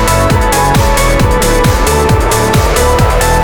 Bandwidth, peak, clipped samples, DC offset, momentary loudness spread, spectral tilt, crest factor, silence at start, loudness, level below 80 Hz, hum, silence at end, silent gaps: over 20 kHz; 0 dBFS; under 0.1%; under 0.1%; 1 LU; -4.5 dB/octave; 8 dB; 0 s; -10 LUFS; -14 dBFS; none; 0 s; none